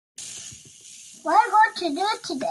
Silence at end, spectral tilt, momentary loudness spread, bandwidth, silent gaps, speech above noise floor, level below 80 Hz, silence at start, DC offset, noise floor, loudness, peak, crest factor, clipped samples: 0 s; -1.5 dB/octave; 23 LU; 12.5 kHz; none; 24 dB; -72 dBFS; 0.2 s; under 0.1%; -46 dBFS; -21 LUFS; -6 dBFS; 18 dB; under 0.1%